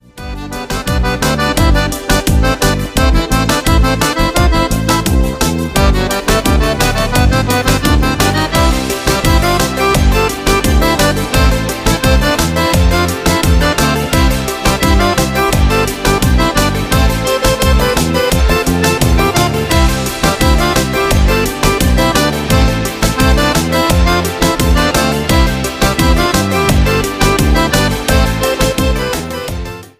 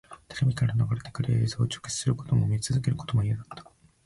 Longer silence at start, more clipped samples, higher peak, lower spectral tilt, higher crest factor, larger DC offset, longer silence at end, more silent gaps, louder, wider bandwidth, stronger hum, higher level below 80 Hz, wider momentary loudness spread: about the same, 0.15 s vs 0.1 s; neither; first, 0 dBFS vs -12 dBFS; about the same, -4.5 dB/octave vs -5.5 dB/octave; about the same, 12 dB vs 14 dB; neither; second, 0.1 s vs 0.45 s; neither; first, -12 LUFS vs -28 LUFS; first, 16 kHz vs 11.5 kHz; neither; first, -16 dBFS vs -50 dBFS; second, 3 LU vs 7 LU